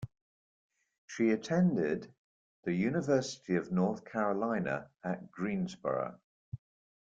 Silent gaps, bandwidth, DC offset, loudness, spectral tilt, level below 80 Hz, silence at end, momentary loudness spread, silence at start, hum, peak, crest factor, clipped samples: 0.21-0.70 s, 0.98-1.08 s, 2.18-2.63 s, 6.24-6.52 s; 7.8 kHz; under 0.1%; -33 LUFS; -7 dB/octave; -70 dBFS; 0.5 s; 16 LU; 0 s; none; -16 dBFS; 18 dB; under 0.1%